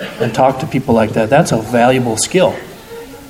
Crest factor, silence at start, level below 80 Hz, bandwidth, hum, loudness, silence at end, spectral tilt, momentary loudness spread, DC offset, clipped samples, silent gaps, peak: 14 dB; 0 s; -44 dBFS; 16.5 kHz; none; -13 LUFS; 0 s; -5 dB/octave; 17 LU; under 0.1%; under 0.1%; none; 0 dBFS